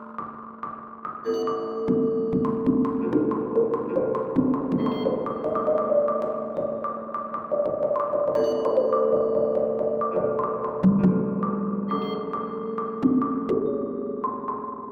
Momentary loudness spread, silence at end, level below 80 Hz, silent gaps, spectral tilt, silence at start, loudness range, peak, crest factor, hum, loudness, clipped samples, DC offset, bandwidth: 9 LU; 0 s; -58 dBFS; none; -9.5 dB/octave; 0 s; 3 LU; -8 dBFS; 16 dB; none; -25 LUFS; under 0.1%; under 0.1%; 6.6 kHz